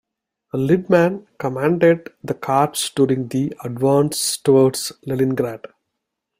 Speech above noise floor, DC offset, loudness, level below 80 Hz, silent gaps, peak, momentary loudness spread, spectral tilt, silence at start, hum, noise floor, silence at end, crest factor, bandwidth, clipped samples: 60 dB; under 0.1%; -19 LUFS; -58 dBFS; none; -2 dBFS; 11 LU; -5.5 dB/octave; 0.55 s; none; -79 dBFS; 0.85 s; 16 dB; 16 kHz; under 0.1%